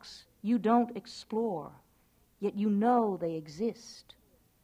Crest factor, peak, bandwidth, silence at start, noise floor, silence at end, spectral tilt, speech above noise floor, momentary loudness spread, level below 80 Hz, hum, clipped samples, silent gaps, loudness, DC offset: 18 dB; -16 dBFS; 11 kHz; 0.05 s; -67 dBFS; 0.65 s; -7 dB/octave; 37 dB; 22 LU; -70 dBFS; none; under 0.1%; none; -31 LUFS; under 0.1%